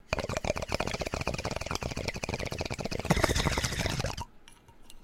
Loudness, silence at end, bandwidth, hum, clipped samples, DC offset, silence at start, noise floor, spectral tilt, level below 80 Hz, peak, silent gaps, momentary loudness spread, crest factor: -32 LUFS; 0 s; 16.5 kHz; none; under 0.1%; under 0.1%; 0.05 s; -54 dBFS; -4 dB/octave; -42 dBFS; -6 dBFS; none; 8 LU; 26 dB